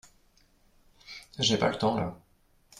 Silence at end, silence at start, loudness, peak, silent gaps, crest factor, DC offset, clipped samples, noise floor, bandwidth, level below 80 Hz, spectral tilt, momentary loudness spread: 0.6 s; 1.1 s; -28 LUFS; -12 dBFS; none; 22 dB; under 0.1%; under 0.1%; -64 dBFS; 14 kHz; -60 dBFS; -4 dB/octave; 20 LU